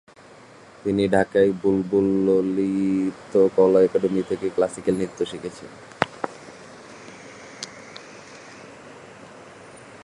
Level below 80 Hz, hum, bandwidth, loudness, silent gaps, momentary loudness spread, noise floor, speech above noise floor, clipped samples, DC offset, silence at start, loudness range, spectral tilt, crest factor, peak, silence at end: -56 dBFS; none; 11.5 kHz; -22 LUFS; none; 24 LU; -48 dBFS; 27 dB; under 0.1%; under 0.1%; 0.85 s; 20 LU; -6.5 dB/octave; 24 dB; 0 dBFS; 0.05 s